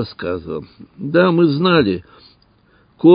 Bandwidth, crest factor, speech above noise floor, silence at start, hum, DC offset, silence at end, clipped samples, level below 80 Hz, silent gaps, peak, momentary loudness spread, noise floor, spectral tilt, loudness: 5.2 kHz; 16 dB; 37 dB; 0 s; none; under 0.1%; 0 s; under 0.1%; -48 dBFS; none; 0 dBFS; 16 LU; -54 dBFS; -12 dB/octave; -16 LUFS